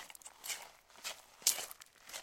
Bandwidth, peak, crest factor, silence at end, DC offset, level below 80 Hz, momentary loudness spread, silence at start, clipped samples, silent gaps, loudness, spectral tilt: 17 kHz; -8 dBFS; 36 dB; 0 s; under 0.1%; -80 dBFS; 18 LU; 0 s; under 0.1%; none; -39 LUFS; 2.5 dB/octave